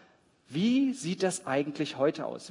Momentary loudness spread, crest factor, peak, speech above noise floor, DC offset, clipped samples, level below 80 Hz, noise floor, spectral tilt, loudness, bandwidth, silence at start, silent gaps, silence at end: 8 LU; 16 dB; -14 dBFS; 31 dB; under 0.1%; under 0.1%; -78 dBFS; -62 dBFS; -5 dB/octave; -30 LUFS; 11 kHz; 0.5 s; none; 0 s